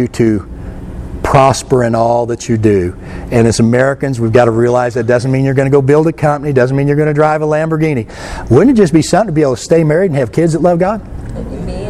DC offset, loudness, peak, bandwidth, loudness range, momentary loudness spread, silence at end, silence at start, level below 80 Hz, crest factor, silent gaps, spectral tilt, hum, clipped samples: under 0.1%; -11 LUFS; 0 dBFS; 13 kHz; 1 LU; 13 LU; 0 s; 0 s; -32 dBFS; 12 dB; none; -7 dB/octave; none; 0.2%